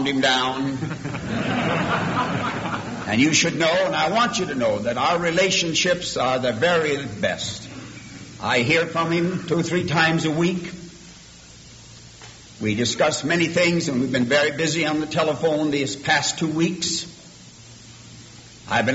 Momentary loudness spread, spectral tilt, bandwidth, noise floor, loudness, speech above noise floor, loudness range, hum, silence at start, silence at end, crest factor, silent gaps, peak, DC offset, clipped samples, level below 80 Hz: 17 LU; -4 dB/octave; 8.2 kHz; -44 dBFS; -21 LUFS; 23 dB; 4 LU; none; 0 s; 0 s; 18 dB; none; -4 dBFS; under 0.1%; under 0.1%; -52 dBFS